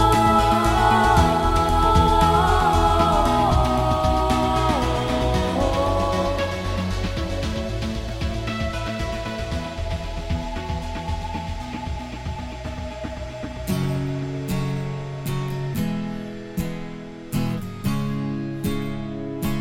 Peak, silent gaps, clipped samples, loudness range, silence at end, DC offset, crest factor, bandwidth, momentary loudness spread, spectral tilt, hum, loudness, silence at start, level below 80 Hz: -4 dBFS; none; under 0.1%; 11 LU; 0 s; under 0.1%; 18 dB; 16.5 kHz; 14 LU; -6 dB/octave; none; -23 LUFS; 0 s; -30 dBFS